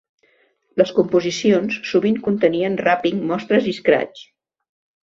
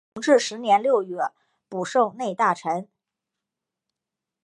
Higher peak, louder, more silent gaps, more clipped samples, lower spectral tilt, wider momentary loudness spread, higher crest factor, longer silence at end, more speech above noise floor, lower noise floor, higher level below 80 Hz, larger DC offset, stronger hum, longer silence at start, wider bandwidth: first, -2 dBFS vs -6 dBFS; first, -19 LUFS vs -23 LUFS; neither; neither; first, -5.5 dB/octave vs -4 dB/octave; second, 3 LU vs 11 LU; about the same, 18 dB vs 20 dB; second, 0.8 s vs 1.6 s; second, 43 dB vs 64 dB; second, -61 dBFS vs -87 dBFS; first, -60 dBFS vs -80 dBFS; neither; neither; first, 0.75 s vs 0.15 s; second, 7.6 kHz vs 11 kHz